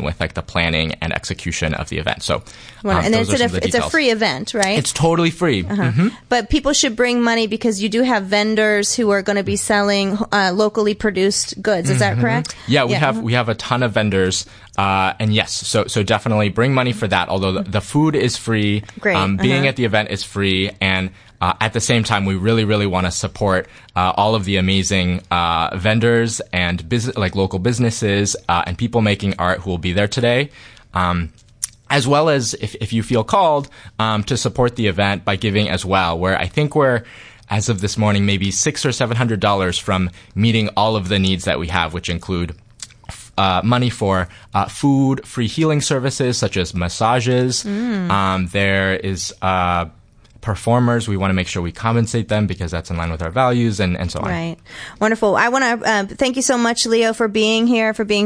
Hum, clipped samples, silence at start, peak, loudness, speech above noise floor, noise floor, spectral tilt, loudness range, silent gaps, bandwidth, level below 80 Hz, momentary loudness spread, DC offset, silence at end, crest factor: none; under 0.1%; 0 s; 0 dBFS; -18 LUFS; 20 dB; -37 dBFS; -4.5 dB/octave; 3 LU; none; 10.5 kHz; -40 dBFS; 7 LU; under 0.1%; 0 s; 18 dB